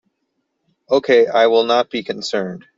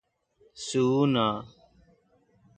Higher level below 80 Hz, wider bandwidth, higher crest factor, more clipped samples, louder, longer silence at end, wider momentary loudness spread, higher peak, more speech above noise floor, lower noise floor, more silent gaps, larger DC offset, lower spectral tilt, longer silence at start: about the same, -64 dBFS vs -64 dBFS; second, 7.8 kHz vs 9.4 kHz; about the same, 14 dB vs 18 dB; neither; first, -16 LUFS vs -26 LUFS; second, 0.2 s vs 1.15 s; second, 10 LU vs 14 LU; first, -2 dBFS vs -12 dBFS; first, 56 dB vs 40 dB; first, -72 dBFS vs -65 dBFS; neither; neither; second, -4 dB/octave vs -6 dB/octave; first, 0.9 s vs 0.55 s